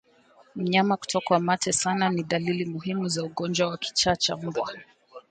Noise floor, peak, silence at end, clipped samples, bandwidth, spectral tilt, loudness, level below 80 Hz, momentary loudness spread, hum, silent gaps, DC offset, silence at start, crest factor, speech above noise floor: -58 dBFS; -8 dBFS; 0.1 s; under 0.1%; 9.6 kHz; -4 dB/octave; -26 LUFS; -60 dBFS; 8 LU; none; none; under 0.1%; 0.55 s; 20 dB; 32 dB